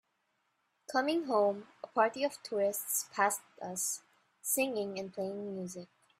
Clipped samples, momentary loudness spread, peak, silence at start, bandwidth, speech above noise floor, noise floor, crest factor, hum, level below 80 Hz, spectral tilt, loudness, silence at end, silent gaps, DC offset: under 0.1%; 11 LU; -14 dBFS; 0.9 s; 16 kHz; 45 dB; -79 dBFS; 22 dB; none; -84 dBFS; -3 dB/octave; -34 LUFS; 0.35 s; none; under 0.1%